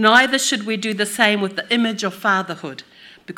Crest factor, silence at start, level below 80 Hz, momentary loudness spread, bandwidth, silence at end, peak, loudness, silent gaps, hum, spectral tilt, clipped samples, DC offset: 20 dB; 0 s; -68 dBFS; 15 LU; 18.5 kHz; 0.05 s; 0 dBFS; -18 LUFS; none; none; -2.5 dB/octave; under 0.1%; under 0.1%